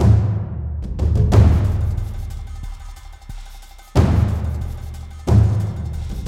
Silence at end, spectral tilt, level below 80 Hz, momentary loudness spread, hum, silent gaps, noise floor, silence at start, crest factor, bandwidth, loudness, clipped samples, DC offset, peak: 0 s; -8.5 dB/octave; -24 dBFS; 23 LU; none; none; -38 dBFS; 0 s; 16 dB; 10 kHz; -19 LUFS; under 0.1%; under 0.1%; -2 dBFS